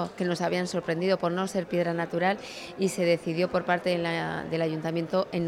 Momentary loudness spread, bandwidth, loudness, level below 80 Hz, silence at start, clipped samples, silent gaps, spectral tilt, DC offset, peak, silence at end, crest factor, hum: 4 LU; 14 kHz; -28 LUFS; -64 dBFS; 0 s; under 0.1%; none; -5.5 dB/octave; under 0.1%; -12 dBFS; 0 s; 16 dB; none